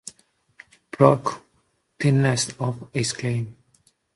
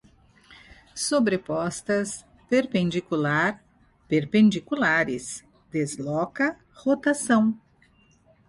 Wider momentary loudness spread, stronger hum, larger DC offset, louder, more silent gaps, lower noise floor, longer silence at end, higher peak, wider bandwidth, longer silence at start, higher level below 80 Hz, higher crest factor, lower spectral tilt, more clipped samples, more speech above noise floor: first, 20 LU vs 12 LU; neither; neither; about the same, -22 LUFS vs -24 LUFS; neither; first, -68 dBFS vs -60 dBFS; second, 0.65 s vs 0.9 s; first, 0 dBFS vs -10 dBFS; about the same, 11.5 kHz vs 11.5 kHz; second, 0.05 s vs 0.95 s; about the same, -60 dBFS vs -62 dBFS; first, 24 dB vs 16 dB; about the same, -5.5 dB/octave vs -5 dB/octave; neither; first, 46 dB vs 36 dB